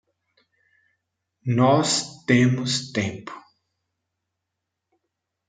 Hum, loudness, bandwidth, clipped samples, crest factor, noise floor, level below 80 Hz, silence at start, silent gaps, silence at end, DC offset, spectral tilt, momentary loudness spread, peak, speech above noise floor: none; -21 LUFS; 9.6 kHz; under 0.1%; 22 dB; -82 dBFS; -68 dBFS; 1.45 s; none; 2.1 s; under 0.1%; -5 dB/octave; 19 LU; -4 dBFS; 61 dB